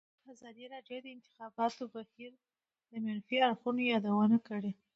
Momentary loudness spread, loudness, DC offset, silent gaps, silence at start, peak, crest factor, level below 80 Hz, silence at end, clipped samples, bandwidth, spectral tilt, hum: 22 LU; -33 LUFS; under 0.1%; none; 0.3 s; -16 dBFS; 18 dB; -84 dBFS; 0.25 s; under 0.1%; 7.6 kHz; -4 dB/octave; none